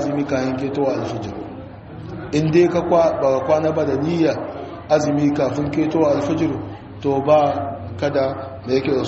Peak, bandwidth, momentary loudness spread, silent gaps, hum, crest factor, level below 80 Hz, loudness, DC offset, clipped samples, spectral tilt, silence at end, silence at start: -2 dBFS; 8 kHz; 15 LU; none; none; 16 dB; -48 dBFS; -19 LUFS; under 0.1%; under 0.1%; -6.5 dB/octave; 0 s; 0 s